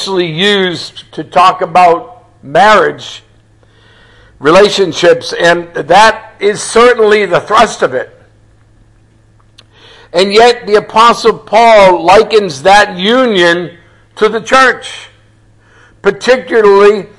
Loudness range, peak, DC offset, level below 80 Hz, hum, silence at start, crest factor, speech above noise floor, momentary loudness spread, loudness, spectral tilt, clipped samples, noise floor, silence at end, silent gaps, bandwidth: 5 LU; 0 dBFS; under 0.1%; -42 dBFS; none; 0 s; 10 dB; 37 dB; 10 LU; -8 LUFS; -3.5 dB/octave; 1%; -45 dBFS; 0.1 s; none; 12 kHz